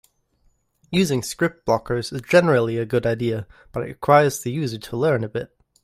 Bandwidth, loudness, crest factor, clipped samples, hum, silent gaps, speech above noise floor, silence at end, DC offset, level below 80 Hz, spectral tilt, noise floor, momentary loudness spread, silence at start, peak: 16 kHz; -21 LUFS; 20 dB; under 0.1%; none; none; 43 dB; 0.4 s; under 0.1%; -52 dBFS; -5.5 dB/octave; -63 dBFS; 14 LU; 0.9 s; -2 dBFS